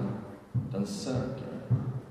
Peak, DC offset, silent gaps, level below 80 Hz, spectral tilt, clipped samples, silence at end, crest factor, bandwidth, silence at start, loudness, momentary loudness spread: -16 dBFS; under 0.1%; none; -56 dBFS; -7 dB/octave; under 0.1%; 0 s; 16 dB; 12.5 kHz; 0 s; -34 LUFS; 6 LU